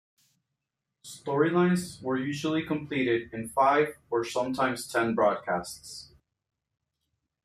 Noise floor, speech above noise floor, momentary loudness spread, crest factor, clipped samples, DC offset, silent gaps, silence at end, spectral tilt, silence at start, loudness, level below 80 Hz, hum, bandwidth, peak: -85 dBFS; 58 dB; 15 LU; 20 dB; under 0.1%; under 0.1%; none; 1.4 s; -5.5 dB/octave; 1.05 s; -28 LUFS; -66 dBFS; none; 14.5 kHz; -10 dBFS